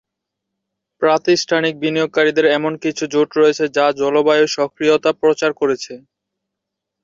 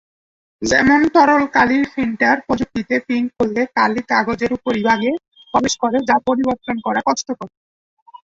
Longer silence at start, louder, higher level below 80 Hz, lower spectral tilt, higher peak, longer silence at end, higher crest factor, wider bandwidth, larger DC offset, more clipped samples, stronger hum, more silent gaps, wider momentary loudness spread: first, 1 s vs 0.6 s; about the same, -16 LUFS vs -17 LUFS; second, -62 dBFS vs -48 dBFS; about the same, -4 dB/octave vs -4 dB/octave; about the same, -2 dBFS vs -2 dBFS; first, 1.05 s vs 0.8 s; about the same, 14 dB vs 16 dB; about the same, 7.6 kHz vs 7.8 kHz; neither; neither; neither; second, none vs 5.28-5.32 s; second, 6 LU vs 9 LU